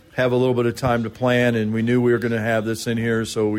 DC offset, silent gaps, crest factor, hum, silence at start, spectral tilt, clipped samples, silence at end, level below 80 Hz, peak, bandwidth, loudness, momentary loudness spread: under 0.1%; none; 12 dB; none; 0.15 s; -6.5 dB/octave; under 0.1%; 0 s; -50 dBFS; -8 dBFS; 16 kHz; -20 LUFS; 4 LU